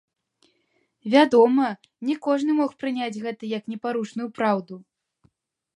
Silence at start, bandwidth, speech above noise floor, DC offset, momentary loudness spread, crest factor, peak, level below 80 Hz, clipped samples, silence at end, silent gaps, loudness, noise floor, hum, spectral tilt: 1.05 s; 11 kHz; 47 dB; under 0.1%; 14 LU; 20 dB; -4 dBFS; -76 dBFS; under 0.1%; 0.95 s; none; -23 LUFS; -70 dBFS; none; -6 dB/octave